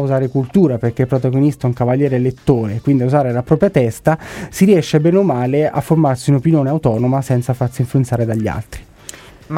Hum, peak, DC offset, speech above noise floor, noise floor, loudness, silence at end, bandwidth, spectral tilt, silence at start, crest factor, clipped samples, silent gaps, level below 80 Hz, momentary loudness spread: none; -2 dBFS; under 0.1%; 22 dB; -37 dBFS; -15 LUFS; 0 s; 15.5 kHz; -8 dB/octave; 0 s; 14 dB; under 0.1%; none; -42 dBFS; 7 LU